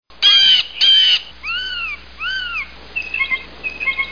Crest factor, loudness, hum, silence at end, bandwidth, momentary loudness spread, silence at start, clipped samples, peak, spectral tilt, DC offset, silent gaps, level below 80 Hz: 16 dB; -13 LUFS; none; 0 s; 5.4 kHz; 16 LU; 0.2 s; under 0.1%; -2 dBFS; 0.5 dB/octave; 0.8%; none; -46 dBFS